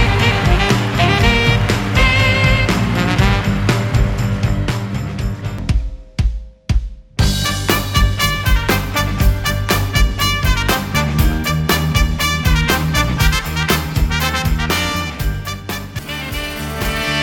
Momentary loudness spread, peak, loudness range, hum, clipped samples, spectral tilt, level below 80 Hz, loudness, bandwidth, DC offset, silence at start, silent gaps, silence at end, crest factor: 10 LU; 0 dBFS; 6 LU; none; under 0.1%; -4.5 dB/octave; -20 dBFS; -16 LUFS; 18 kHz; under 0.1%; 0 s; none; 0 s; 16 dB